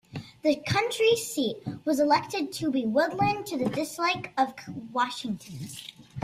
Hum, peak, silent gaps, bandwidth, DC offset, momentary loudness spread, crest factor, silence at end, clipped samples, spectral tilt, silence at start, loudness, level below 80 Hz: none; -10 dBFS; none; 15.5 kHz; under 0.1%; 15 LU; 18 dB; 0 s; under 0.1%; -4.5 dB/octave; 0.1 s; -27 LUFS; -62 dBFS